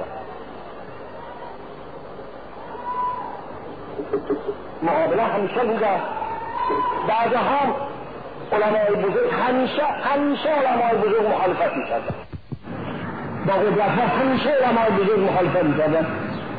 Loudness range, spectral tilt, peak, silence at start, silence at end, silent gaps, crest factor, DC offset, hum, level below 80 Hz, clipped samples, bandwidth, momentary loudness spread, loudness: 11 LU; -9.5 dB/octave; -10 dBFS; 0 s; 0 s; none; 12 dB; 0.7%; none; -54 dBFS; under 0.1%; 5 kHz; 18 LU; -21 LUFS